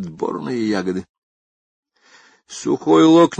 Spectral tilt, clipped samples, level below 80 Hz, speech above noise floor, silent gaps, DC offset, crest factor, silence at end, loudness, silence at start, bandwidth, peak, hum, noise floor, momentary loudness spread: -6 dB/octave; under 0.1%; -60 dBFS; 35 dB; 1.09-1.83 s; under 0.1%; 16 dB; 0.05 s; -18 LUFS; 0 s; 9 kHz; -2 dBFS; none; -52 dBFS; 17 LU